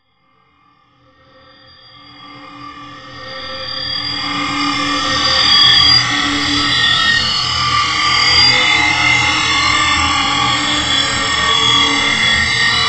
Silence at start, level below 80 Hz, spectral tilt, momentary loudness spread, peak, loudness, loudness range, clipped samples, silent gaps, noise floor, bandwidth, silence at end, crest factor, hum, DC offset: 2.1 s; -38 dBFS; -1.5 dB/octave; 16 LU; 0 dBFS; -11 LUFS; 13 LU; under 0.1%; none; -56 dBFS; 11 kHz; 0 s; 14 dB; none; under 0.1%